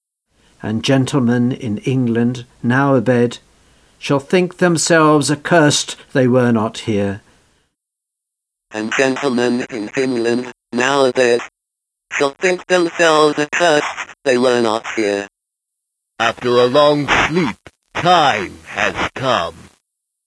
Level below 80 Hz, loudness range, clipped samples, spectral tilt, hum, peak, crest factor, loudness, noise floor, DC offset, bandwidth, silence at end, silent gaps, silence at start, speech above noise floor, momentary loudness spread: -50 dBFS; 5 LU; under 0.1%; -4.5 dB/octave; none; 0 dBFS; 16 dB; -16 LUFS; -81 dBFS; under 0.1%; 11 kHz; 0.65 s; none; 0.65 s; 65 dB; 11 LU